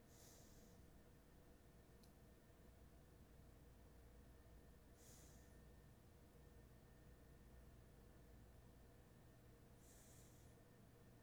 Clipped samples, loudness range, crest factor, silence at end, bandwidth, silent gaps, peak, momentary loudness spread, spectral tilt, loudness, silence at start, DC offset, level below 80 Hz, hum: under 0.1%; 1 LU; 14 dB; 0 s; over 20 kHz; none; -52 dBFS; 3 LU; -5 dB/octave; -68 LUFS; 0 s; under 0.1%; -70 dBFS; none